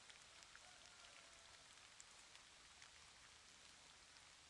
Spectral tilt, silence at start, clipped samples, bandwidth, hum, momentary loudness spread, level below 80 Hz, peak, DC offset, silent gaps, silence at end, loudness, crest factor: 0 dB/octave; 0 s; under 0.1%; 12 kHz; none; 2 LU; -84 dBFS; -40 dBFS; under 0.1%; none; 0 s; -62 LUFS; 24 dB